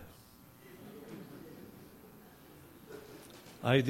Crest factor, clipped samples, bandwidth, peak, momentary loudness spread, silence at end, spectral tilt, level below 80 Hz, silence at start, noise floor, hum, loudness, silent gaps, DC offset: 24 dB; under 0.1%; 16.5 kHz; -14 dBFS; 10 LU; 0 s; -6.5 dB/octave; -70 dBFS; 0 s; -58 dBFS; none; -43 LUFS; none; under 0.1%